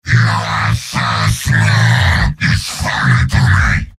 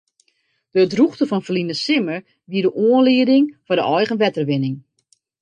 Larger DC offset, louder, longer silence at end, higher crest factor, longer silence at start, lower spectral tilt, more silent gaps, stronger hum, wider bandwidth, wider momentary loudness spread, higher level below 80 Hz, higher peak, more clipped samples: neither; first, -13 LUFS vs -18 LUFS; second, 0.1 s vs 0.6 s; about the same, 12 dB vs 14 dB; second, 0.05 s vs 0.75 s; second, -4.5 dB/octave vs -6.5 dB/octave; neither; neither; first, 15 kHz vs 9.2 kHz; second, 5 LU vs 11 LU; first, -24 dBFS vs -66 dBFS; first, 0 dBFS vs -4 dBFS; neither